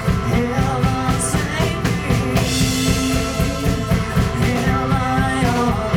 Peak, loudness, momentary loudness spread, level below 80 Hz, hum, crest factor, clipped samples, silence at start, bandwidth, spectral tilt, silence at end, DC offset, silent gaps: -4 dBFS; -18 LUFS; 2 LU; -28 dBFS; none; 14 dB; under 0.1%; 0 s; 19 kHz; -5 dB/octave; 0 s; under 0.1%; none